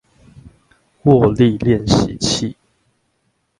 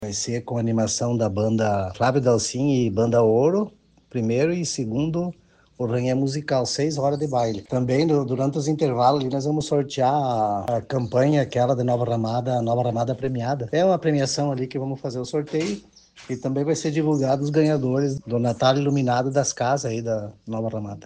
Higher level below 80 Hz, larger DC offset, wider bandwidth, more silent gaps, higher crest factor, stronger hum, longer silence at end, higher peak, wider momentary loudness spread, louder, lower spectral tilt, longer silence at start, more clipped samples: first, -38 dBFS vs -58 dBFS; neither; first, 11.5 kHz vs 10 kHz; neither; about the same, 18 dB vs 18 dB; neither; first, 1.05 s vs 0.05 s; first, 0 dBFS vs -4 dBFS; about the same, 8 LU vs 8 LU; first, -15 LUFS vs -23 LUFS; about the same, -6 dB/octave vs -6 dB/octave; first, 0.45 s vs 0 s; neither